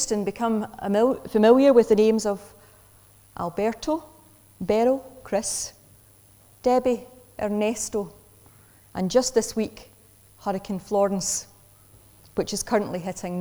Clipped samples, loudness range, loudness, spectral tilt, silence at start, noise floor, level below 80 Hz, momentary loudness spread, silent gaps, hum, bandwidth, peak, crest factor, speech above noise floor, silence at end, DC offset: under 0.1%; 7 LU; -24 LUFS; -4.5 dB/octave; 0 s; -54 dBFS; -54 dBFS; 15 LU; none; none; over 20 kHz; -6 dBFS; 20 dB; 31 dB; 0 s; under 0.1%